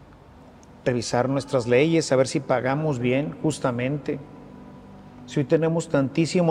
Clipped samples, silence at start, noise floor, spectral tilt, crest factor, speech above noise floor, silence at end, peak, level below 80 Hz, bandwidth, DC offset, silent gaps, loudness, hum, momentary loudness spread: under 0.1%; 0 s; -48 dBFS; -6 dB/octave; 18 dB; 25 dB; 0 s; -6 dBFS; -56 dBFS; 11.5 kHz; under 0.1%; none; -23 LUFS; none; 20 LU